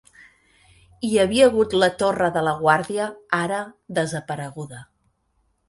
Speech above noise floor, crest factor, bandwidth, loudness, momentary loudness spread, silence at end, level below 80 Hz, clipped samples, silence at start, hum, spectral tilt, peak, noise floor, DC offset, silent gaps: 47 dB; 20 dB; 11.5 kHz; -21 LUFS; 14 LU; 0.85 s; -54 dBFS; under 0.1%; 1 s; none; -4.5 dB/octave; -2 dBFS; -68 dBFS; under 0.1%; none